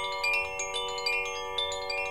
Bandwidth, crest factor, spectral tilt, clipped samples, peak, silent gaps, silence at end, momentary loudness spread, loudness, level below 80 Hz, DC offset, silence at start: 17 kHz; 14 dB; 0 dB/octave; under 0.1%; -16 dBFS; none; 0 s; 4 LU; -30 LUFS; -56 dBFS; 0.3%; 0 s